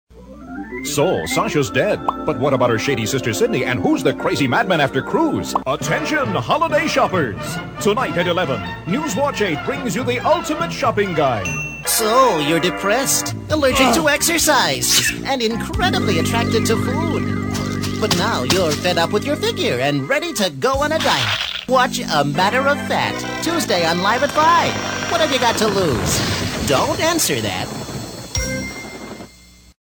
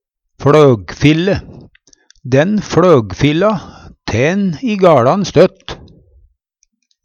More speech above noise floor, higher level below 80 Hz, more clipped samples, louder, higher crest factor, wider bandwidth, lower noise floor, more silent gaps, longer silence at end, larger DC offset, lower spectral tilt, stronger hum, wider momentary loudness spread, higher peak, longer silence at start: second, 28 dB vs 52 dB; about the same, -40 dBFS vs -40 dBFS; neither; second, -18 LUFS vs -12 LUFS; about the same, 16 dB vs 14 dB; first, over 20 kHz vs 8.4 kHz; second, -46 dBFS vs -63 dBFS; neither; second, 0.65 s vs 1.3 s; neither; second, -3.5 dB/octave vs -6.5 dB/octave; neither; second, 8 LU vs 14 LU; about the same, -2 dBFS vs 0 dBFS; second, 0.1 s vs 0.4 s